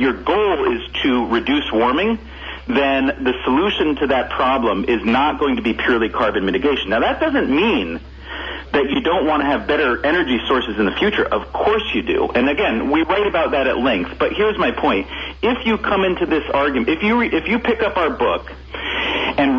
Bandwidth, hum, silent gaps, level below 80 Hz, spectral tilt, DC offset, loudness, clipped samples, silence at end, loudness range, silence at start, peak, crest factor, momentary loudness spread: 7 kHz; none; none; -38 dBFS; -6.5 dB/octave; under 0.1%; -18 LUFS; under 0.1%; 0 s; 1 LU; 0 s; -6 dBFS; 12 dB; 5 LU